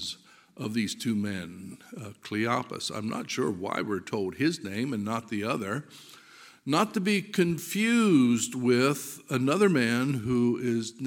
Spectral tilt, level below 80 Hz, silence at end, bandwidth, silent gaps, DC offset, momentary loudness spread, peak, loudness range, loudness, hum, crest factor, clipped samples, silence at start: -5 dB/octave; -68 dBFS; 0 s; 17 kHz; none; under 0.1%; 15 LU; -10 dBFS; 7 LU; -28 LUFS; none; 20 dB; under 0.1%; 0 s